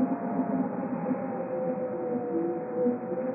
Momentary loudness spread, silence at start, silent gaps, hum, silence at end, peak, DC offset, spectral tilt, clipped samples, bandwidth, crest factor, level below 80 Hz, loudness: 3 LU; 0 s; none; none; 0 s; -16 dBFS; under 0.1%; -5.5 dB/octave; under 0.1%; 2.8 kHz; 14 dB; -76 dBFS; -31 LUFS